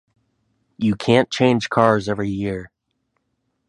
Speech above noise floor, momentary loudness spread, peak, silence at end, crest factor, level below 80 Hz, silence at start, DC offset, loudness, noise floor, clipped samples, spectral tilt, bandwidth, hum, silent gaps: 54 dB; 9 LU; 0 dBFS; 1.05 s; 20 dB; -50 dBFS; 0.8 s; under 0.1%; -19 LUFS; -72 dBFS; under 0.1%; -6 dB/octave; 11 kHz; none; none